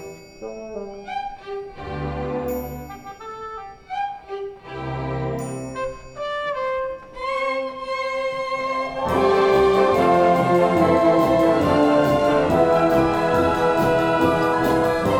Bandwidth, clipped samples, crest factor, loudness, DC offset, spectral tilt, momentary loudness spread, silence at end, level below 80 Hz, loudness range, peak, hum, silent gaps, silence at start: 19.5 kHz; under 0.1%; 16 dB; -20 LUFS; under 0.1%; -6.5 dB/octave; 17 LU; 0 s; -44 dBFS; 13 LU; -4 dBFS; none; none; 0 s